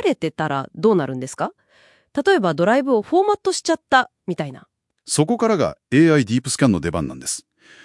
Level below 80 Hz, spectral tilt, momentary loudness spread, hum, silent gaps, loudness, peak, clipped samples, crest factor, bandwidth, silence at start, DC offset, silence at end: -54 dBFS; -5 dB/octave; 11 LU; none; none; -19 LUFS; 0 dBFS; under 0.1%; 18 dB; 12 kHz; 0 s; under 0.1%; 0.45 s